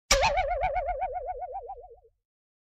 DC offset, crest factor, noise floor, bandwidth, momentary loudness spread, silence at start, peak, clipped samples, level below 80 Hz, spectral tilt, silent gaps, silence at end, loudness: under 0.1%; 22 dB; -51 dBFS; 12.5 kHz; 18 LU; 0.1 s; -8 dBFS; under 0.1%; -40 dBFS; -1.5 dB/octave; none; 0.65 s; -29 LUFS